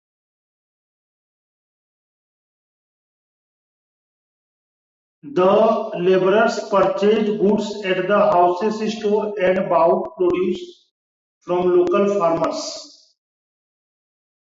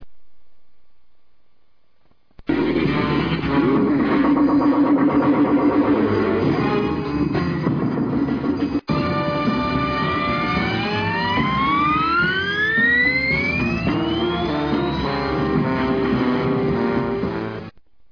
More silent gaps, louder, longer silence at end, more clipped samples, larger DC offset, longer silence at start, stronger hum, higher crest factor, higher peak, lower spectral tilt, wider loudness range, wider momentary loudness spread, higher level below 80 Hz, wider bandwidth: first, 10.91-11.41 s vs none; about the same, -18 LUFS vs -19 LUFS; first, 1.7 s vs 0.3 s; neither; neither; first, 5.25 s vs 0 s; neither; about the same, 16 dB vs 14 dB; about the same, -6 dBFS vs -6 dBFS; second, -6 dB/octave vs -8 dB/octave; about the same, 4 LU vs 4 LU; about the same, 8 LU vs 6 LU; second, -60 dBFS vs -40 dBFS; first, 7.8 kHz vs 5.4 kHz